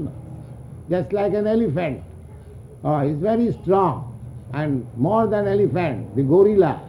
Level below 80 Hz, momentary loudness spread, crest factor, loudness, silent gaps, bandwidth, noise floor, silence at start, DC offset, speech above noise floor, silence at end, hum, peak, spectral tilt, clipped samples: -46 dBFS; 21 LU; 16 dB; -20 LUFS; none; 11 kHz; -40 dBFS; 0 s; under 0.1%; 20 dB; 0 s; none; -4 dBFS; -9.5 dB/octave; under 0.1%